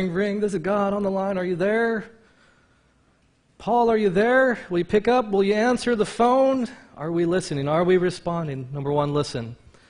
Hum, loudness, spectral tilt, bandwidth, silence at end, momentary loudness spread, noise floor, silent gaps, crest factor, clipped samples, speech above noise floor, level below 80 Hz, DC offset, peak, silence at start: none; -22 LUFS; -6.5 dB/octave; 10.5 kHz; 0.35 s; 11 LU; -62 dBFS; none; 16 dB; under 0.1%; 40 dB; -54 dBFS; under 0.1%; -8 dBFS; 0 s